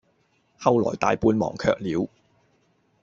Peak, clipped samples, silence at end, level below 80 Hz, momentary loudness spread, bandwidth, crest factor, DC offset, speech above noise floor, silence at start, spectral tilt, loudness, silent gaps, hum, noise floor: -4 dBFS; under 0.1%; 0.95 s; -52 dBFS; 7 LU; 7.6 kHz; 22 dB; under 0.1%; 44 dB; 0.6 s; -6.5 dB/octave; -24 LUFS; none; none; -66 dBFS